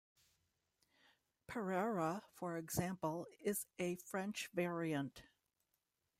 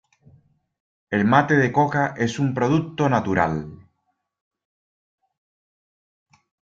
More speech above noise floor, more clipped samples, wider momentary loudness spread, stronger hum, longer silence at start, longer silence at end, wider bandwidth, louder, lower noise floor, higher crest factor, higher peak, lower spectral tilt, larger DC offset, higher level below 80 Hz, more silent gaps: second, 45 dB vs 54 dB; neither; about the same, 7 LU vs 7 LU; neither; first, 1.5 s vs 1.1 s; second, 0.95 s vs 2.95 s; first, 16 kHz vs 7.8 kHz; second, -43 LUFS vs -21 LUFS; first, -87 dBFS vs -74 dBFS; about the same, 18 dB vs 22 dB; second, -26 dBFS vs -2 dBFS; second, -5 dB/octave vs -7 dB/octave; neither; second, -74 dBFS vs -58 dBFS; neither